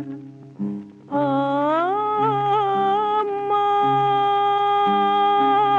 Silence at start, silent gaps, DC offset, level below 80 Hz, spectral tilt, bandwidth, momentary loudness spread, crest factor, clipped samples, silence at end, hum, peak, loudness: 0 s; none; under 0.1%; -74 dBFS; -7 dB/octave; 7 kHz; 12 LU; 12 dB; under 0.1%; 0 s; none; -8 dBFS; -20 LUFS